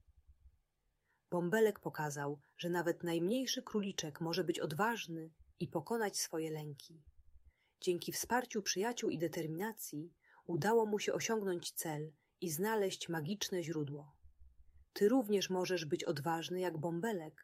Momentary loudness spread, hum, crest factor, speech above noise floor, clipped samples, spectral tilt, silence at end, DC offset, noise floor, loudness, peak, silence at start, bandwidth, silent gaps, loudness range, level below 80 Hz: 12 LU; none; 18 dB; 44 dB; under 0.1%; -4.5 dB/octave; 0.15 s; under 0.1%; -82 dBFS; -38 LUFS; -20 dBFS; 0.3 s; 16 kHz; none; 3 LU; -74 dBFS